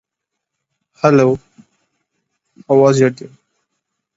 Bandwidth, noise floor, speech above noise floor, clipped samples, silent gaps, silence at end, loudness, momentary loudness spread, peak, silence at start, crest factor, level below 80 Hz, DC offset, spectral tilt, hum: 8 kHz; -79 dBFS; 67 dB; under 0.1%; none; 0.9 s; -14 LUFS; 10 LU; 0 dBFS; 1.05 s; 18 dB; -58 dBFS; under 0.1%; -7 dB/octave; none